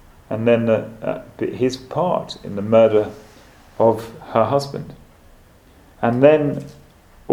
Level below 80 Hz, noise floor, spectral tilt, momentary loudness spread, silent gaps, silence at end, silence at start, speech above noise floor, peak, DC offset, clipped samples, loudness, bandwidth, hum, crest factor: -50 dBFS; -49 dBFS; -7 dB/octave; 15 LU; none; 0 s; 0.3 s; 31 dB; 0 dBFS; under 0.1%; under 0.1%; -19 LUFS; 14.5 kHz; none; 20 dB